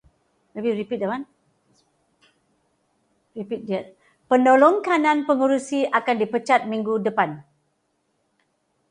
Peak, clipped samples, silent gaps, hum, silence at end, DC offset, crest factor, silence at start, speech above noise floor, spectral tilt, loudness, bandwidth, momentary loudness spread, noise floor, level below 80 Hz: -4 dBFS; under 0.1%; none; none; 1.5 s; under 0.1%; 20 dB; 0.55 s; 50 dB; -5.5 dB/octave; -21 LUFS; 10.5 kHz; 16 LU; -71 dBFS; -72 dBFS